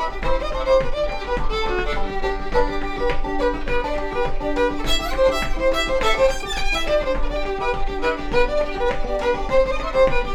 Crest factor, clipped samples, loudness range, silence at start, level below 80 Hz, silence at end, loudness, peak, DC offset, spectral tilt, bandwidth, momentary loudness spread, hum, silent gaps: 16 dB; under 0.1%; 3 LU; 0 s; -26 dBFS; 0 s; -22 LUFS; -4 dBFS; under 0.1%; -4.5 dB/octave; 13.5 kHz; 6 LU; none; none